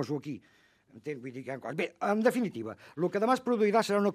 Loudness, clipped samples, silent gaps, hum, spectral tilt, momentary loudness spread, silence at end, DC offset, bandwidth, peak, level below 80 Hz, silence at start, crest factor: -30 LUFS; under 0.1%; none; none; -6 dB/octave; 15 LU; 0 s; under 0.1%; 14.5 kHz; -12 dBFS; -80 dBFS; 0 s; 20 dB